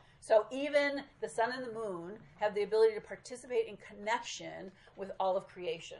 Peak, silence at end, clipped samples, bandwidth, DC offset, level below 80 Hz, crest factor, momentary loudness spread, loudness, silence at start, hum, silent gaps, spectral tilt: -16 dBFS; 0 s; under 0.1%; 11.5 kHz; under 0.1%; -70 dBFS; 20 dB; 16 LU; -34 LUFS; 0.2 s; none; none; -3.5 dB/octave